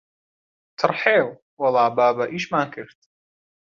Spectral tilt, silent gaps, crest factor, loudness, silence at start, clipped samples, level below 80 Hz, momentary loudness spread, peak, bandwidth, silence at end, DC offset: -5.5 dB/octave; 1.42-1.57 s; 22 dB; -21 LUFS; 0.8 s; under 0.1%; -68 dBFS; 12 LU; -2 dBFS; 7.4 kHz; 0.9 s; under 0.1%